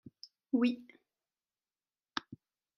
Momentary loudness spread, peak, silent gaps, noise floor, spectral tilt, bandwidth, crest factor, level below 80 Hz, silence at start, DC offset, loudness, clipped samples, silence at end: 25 LU; -14 dBFS; none; under -90 dBFS; -5.5 dB/octave; 7 kHz; 26 dB; -86 dBFS; 0.55 s; under 0.1%; -36 LUFS; under 0.1%; 0.4 s